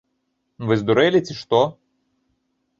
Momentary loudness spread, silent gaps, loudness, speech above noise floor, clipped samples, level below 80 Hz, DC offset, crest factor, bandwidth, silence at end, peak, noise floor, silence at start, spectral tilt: 7 LU; none; -20 LUFS; 54 dB; under 0.1%; -60 dBFS; under 0.1%; 20 dB; 7.6 kHz; 1.05 s; -2 dBFS; -72 dBFS; 0.6 s; -6.5 dB/octave